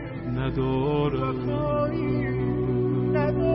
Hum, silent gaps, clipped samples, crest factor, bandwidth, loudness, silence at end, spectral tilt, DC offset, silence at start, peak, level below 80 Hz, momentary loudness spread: none; none; under 0.1%; 12 dB; 5.6 kHz; -26 LUFS; 0 s; -12.5 dB/octave; under 0.1%; 0 s; -12 dBFS; -40 dBFS; 3 LU